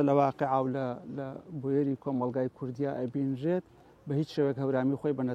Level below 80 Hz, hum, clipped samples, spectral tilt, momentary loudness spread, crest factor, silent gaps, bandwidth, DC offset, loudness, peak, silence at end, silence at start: -68 dBFS; none; under 0.1%; -9 dB/octave; 10 LU; 18 dB; none; 7.4 kHz; under 0.1%; -31 LUFS; -12 dBFS; 0 s; 0 s